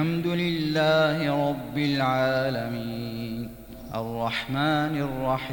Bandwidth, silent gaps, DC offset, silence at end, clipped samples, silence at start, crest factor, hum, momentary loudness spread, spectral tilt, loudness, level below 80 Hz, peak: 17 kHz; none; under 0.1%; 0 s; under 0.1%; 0 s; 14 dB; none; 11 LU; -6.5 dB/octave; -26 LUFS; -50 dBFS; -12 dBFS